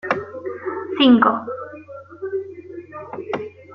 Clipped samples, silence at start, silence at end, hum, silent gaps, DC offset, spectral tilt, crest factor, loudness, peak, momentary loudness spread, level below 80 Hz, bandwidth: under 0.1%; 0.05 s; 0 s; none; none; under 0.1%; -6.5 dB/octave; 20 dB; -20 LUFS; -2 dBFS; 22 LU; -62 dBFS; 6 kHz